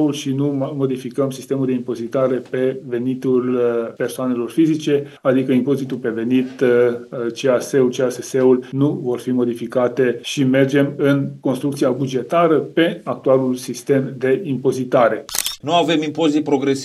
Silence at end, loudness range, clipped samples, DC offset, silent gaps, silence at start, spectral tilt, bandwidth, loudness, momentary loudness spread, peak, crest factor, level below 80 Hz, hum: 0 s; 3 LU; under 0.1%; under 0.1%; none; 0 s; -6 dB/octave; 16 kHz; -19 LUFS; 6 LU; 0 dBFS; 18 dB; -64 dBFS; none